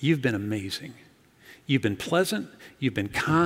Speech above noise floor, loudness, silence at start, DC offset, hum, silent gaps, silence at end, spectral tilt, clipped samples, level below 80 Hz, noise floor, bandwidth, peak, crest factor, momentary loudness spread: 27 dB; -27 LUFS; 0 s; under 0.1%; none; none; 0 s; -5.5 dB/octave; under 0.1%; -60 dBFS; -53 dBFS; 16 kHz; -8 dBFS; 18 dB; 14 LU